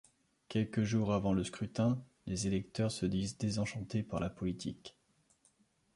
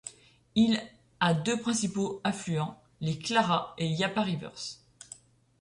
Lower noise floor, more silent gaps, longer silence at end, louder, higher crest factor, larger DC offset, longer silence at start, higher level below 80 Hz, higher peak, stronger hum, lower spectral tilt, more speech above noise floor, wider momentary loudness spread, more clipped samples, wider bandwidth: first, -72 dBFS vs -53 dBFS; neither; first, 1.05 s vs 0.85 s; second, -36 LUFS vs -30 LUFS; about the same, 18 dB vs 20 dB; neither; first, 0.5 s vs 0.05 s; first, -58 dBFS vs -64 dBFS; second, -20 dBFS vs -12 dBFS; neither; first, -6 dB/octave vs -4.5 dB/octave; first, 37 dB vs 24 dB; second, 8 LU vs 21 LU; neither; about the same, 11.5 kHz vs 11 kHz